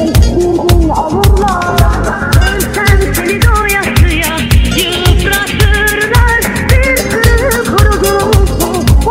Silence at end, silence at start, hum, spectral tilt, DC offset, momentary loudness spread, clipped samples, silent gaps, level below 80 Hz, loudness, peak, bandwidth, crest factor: 0 s; 0 s; none; -5 dB/octave; under 0.1%; 2 LU; 0.6%; none; -14 dBFS; -10 LUFS; 0 dBFS; 16.5 kHz; 8 dB